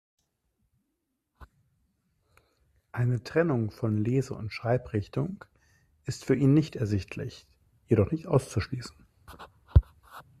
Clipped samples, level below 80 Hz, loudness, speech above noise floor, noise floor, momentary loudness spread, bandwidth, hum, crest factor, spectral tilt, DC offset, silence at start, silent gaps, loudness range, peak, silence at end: under 0.1%; -40 dBFS; -28 LUFS; 53 dB; -80 dBFS; 20 LU; 13 kHz; none; 24 dB; -7.5 dB/octave; under 0.1%; 1.4 s; none; 5 LU; -6 dBFS; 0.2 s